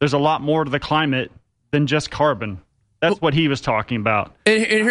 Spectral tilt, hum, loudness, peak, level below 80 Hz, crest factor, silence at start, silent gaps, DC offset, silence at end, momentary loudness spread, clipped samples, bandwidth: -5.5 dB/octave; none; -19 LUFS; -2 dBFS; -48 dBFS; 18 dB; 0 s; none; under 0.1%; 0 s; 7 LU; under 0.1%; 11 kHz